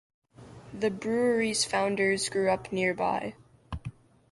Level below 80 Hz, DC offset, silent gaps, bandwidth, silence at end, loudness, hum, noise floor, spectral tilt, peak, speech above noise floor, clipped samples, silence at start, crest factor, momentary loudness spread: -54 dBFS; under 0.1%; none; 11.5 kHz; 0.4 s; -28 LUFS; none; -49 dBFS; -3.5 dB/octave; -14 dBFS; 22 dB; under 0.1%; 0.4 s; 16 dB; 15 LU